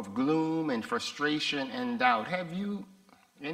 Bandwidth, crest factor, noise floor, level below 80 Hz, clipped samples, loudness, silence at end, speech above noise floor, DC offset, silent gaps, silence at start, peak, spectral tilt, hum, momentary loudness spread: 15 kHz; 22 dB; -51 dBFS; -74 dBFS; under 0.1%; -30 LUFS; 0 s; 21 dB; under 0.1%; none; 0 s; -10 dBFS; -4.5 dB/octave; none; 9 LU